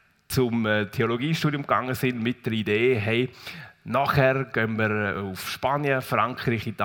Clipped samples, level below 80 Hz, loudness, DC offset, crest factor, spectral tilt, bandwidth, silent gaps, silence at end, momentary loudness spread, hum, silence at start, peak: under 0.1%; -56 dBFS; -25 LUFS; under 0.1%; 20 dB; -6 dB/octave; 18 kHz; none; 0 s; 7 LU; none; 0.3 s; -6 dBFS